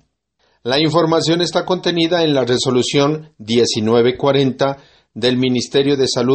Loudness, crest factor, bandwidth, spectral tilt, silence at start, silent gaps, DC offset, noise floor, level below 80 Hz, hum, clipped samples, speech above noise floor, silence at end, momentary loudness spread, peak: -16 LUFS; 16 dB; 8.8 kHz; -5 dB/octave; 0.65 s; none; under 0.1%; -63 dBFS; -54 dBFS; none; under 0.1%; 48 dB; 0 s; 5 LU; 0 dBFS